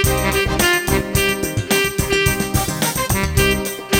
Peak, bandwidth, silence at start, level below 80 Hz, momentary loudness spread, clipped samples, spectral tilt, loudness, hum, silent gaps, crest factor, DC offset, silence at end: -2 dBFS; over 20 kHz; 0 s; -28 dBFS; 4 LU; under 0.1%; -3.5 dB/octave; -17 LUFS; none; none; 16 dB; under 0.1%; 0 s